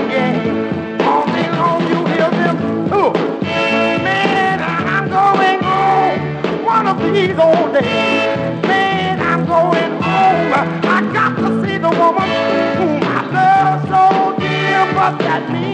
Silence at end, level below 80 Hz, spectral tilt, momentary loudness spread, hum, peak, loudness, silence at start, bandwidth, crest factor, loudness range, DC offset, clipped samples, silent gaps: 0 s; -52 dBFS; -6.5 dB/octave; 5 LU; none; 0 dBFS; -14 LUFS; 0 s; 9.2 kHz; 14 dB; 1 LU; under 0.1%; under 0.1%; none